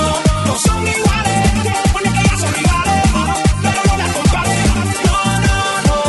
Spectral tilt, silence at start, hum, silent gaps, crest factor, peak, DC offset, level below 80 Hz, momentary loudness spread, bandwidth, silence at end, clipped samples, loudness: -4.5 dB/octave; 0 s; none; none; 14 dB; 0 dBFS; under 0.1%; -20 dBFS; 1 LU; 12 kHz; 0 s; under 0.1%; -14 LUFS